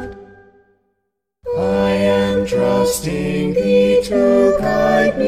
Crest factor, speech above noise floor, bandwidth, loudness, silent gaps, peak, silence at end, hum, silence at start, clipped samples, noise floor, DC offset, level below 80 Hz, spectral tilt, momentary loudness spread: 14 dB; 59 dB; 15.5 kHz; -16 LUFS; none; -2 dBFS; 0 s; none; 0 s; under 0.1%; -74 dBFS; under 0.1%; -40 dBFS; -5.5 dB/octave; 7 LU